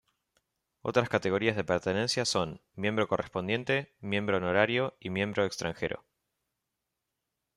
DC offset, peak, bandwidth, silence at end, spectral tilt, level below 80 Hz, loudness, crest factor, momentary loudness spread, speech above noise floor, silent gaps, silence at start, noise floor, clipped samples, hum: under 0.1%; -10 dBFS; 13 kHz; 1.6 s; -4.5 dB/octave; -66 dBFS; -30 LUFS; 22 dB; 7 LU; 55 dB; none; 0.85 s; -85 dBFS; under 0.1%; none